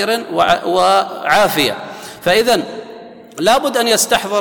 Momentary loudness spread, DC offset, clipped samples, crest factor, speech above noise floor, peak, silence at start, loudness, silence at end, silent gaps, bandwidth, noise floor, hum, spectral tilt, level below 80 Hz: 15 LU; under 0.1%; under 0.1%; 14 dB; 21 dB; -2 dBFS; 0 s; -14 LUFS; 0 s; none; 19 kHz; -35 dBFS; none; -2.5 dB/octave; -50 dBFS